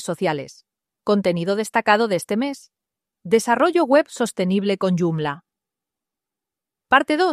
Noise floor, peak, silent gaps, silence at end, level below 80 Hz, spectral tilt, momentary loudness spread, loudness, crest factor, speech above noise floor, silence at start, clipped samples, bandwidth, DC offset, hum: -87 dBFS; -2 dBFS; none; 0 s; -64 dBFS; -5.5 dB/octave; 11 LU; -20 LUFS; 20 dB; 68 dB; 0 s; under 0.1%; 15 kHz; under 0.1%; none